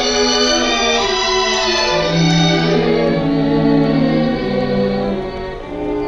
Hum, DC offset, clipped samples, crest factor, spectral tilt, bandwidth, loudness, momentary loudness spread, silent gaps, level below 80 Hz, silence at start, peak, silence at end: none; under 0.1%; under 0.1%; 14 dB; -4.5 dB/octave; 8 kHz; -15 LUFS; 8 LU; none; -34 dBFS; 0 s; 0 dBFS; 0 s